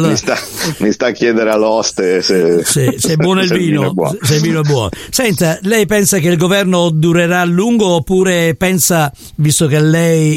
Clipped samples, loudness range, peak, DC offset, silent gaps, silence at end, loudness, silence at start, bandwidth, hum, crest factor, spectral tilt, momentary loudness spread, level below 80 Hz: under 0.1%; 1 LU; 0 dBFS; under 0.1%; none; 0 s; -12 LUFS; 0 s; 16.5 kHz; none; 12 dB; -4.5 dB/octave; 5 LU; -42 dBFS